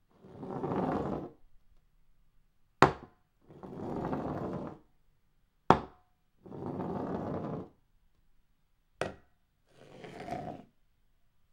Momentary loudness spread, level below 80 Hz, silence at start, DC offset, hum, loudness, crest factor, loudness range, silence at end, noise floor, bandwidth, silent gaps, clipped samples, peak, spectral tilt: 22 LU; -58 dBFS; 0.25 s; under 0.1%; none; -34 LUFS; 38 dB; 11 LU; 0.9 s; -70 dBFS; 15.5 kHz; none; under 0.1%; 0 dBFS; -6.5 dB/octave